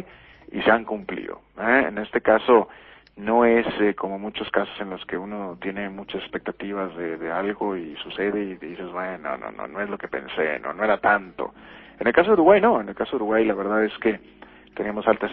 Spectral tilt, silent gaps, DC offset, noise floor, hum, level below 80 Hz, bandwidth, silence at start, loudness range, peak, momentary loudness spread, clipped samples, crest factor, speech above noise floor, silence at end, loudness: -9.5 dB/octave; none; under 0.1%; -47 dBFS; none; -56 dBFS; 4.5 kHz; 0 s; 9 LU; -2 dBFS; 15 LU; under 0.1%; 22 dB; 24 dB; 0 s; -23 LUFS